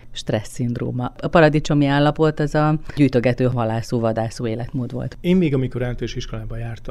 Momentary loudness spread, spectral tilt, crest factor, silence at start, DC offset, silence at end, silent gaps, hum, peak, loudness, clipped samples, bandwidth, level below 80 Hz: 12 LU; -7 dB/octave; 18 dB; 0.05 s; under 0.1%; 0 s; none; none; -2 dBFS; -20 LUFS; under 0.1%; 12.5 kHz; -36 dBFS